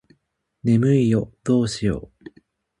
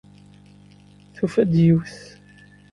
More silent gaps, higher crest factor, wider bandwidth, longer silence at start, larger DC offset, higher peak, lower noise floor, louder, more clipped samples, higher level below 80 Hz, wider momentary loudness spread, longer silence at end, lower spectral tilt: neither; about the same, 14 dB vs 18 dB; about the same, 11 kHz vs 10.5 kHz; second, 0.65 s vs 1.2 s; neither; second, -8 dBFS vs -4 dBFS; first, -71 dBFS vs -49 dBFS; about the same, -21 LUFS vs -19 LUFS; neither; about the same, -48 dBFS vs -52 dBFS; second, 9 LU vs 21 LU; about the same, 0.8 s vs 0.75 s; second, -7.5 dB/octave vs -9 dB/octave